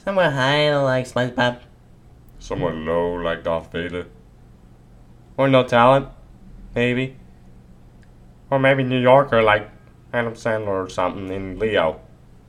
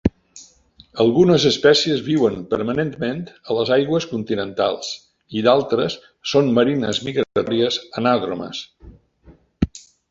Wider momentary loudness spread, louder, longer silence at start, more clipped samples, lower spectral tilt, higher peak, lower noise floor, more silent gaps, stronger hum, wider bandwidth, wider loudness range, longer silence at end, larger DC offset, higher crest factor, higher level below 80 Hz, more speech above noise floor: about the same, 15 LU vs 14 LU; about the same, -20 LUFS vs -19 LUFS; about the same, 0.05 s vs 0.05 s; neither; about the same, -6 dB/octave vs -5.5 dB/octave; about the same, 0 dBFS vs -2 dBFS; second, -47 dBFS vs -51 dBFS; neither; neither; first, 11.5 kHz vs 7.8 kHz; first, 7 LU vs 4 LU; first, 0.5 s vs 0.3 s; neither; about the same, 20 dB vs 18 dB; about the same, -46 dBFS vs -44 dBFS; second, 28 dB vs 32 dB